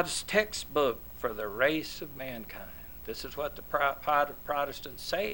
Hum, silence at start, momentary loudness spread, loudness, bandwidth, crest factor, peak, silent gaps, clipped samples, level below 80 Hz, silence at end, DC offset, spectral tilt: none; 0 s; 13 LU; -32 LUFS; 19 kHz; 22 dB; -10 dBFS; none; under 0.1%; -54 dBFS; 0 s; 0.3%; -3 dB/octave